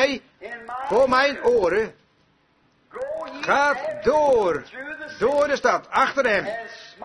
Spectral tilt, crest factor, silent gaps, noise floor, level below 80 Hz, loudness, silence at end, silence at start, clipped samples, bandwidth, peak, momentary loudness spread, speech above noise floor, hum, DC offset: -4 dB/octave; 18 dB; none; -62 dBFS; -54 dBFS; -21 LUFS; 0 s; 0 s; under 0.1%; 11 kHz; -6 dBFS; 15 LU; 41 dB; none; under 0.1%